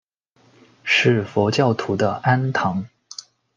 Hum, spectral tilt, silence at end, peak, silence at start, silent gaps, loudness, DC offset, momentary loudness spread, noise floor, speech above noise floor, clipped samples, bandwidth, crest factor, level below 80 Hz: none; -5.5 dB/octave; 0.7 s; -4 dBFS; 0.85 s; none; -19 LUFS; under 0.1%; 19 LU; -59 dBFS; 40 dB; under 0.1%; 9.2 kHz; 18 dB; -64 dBFS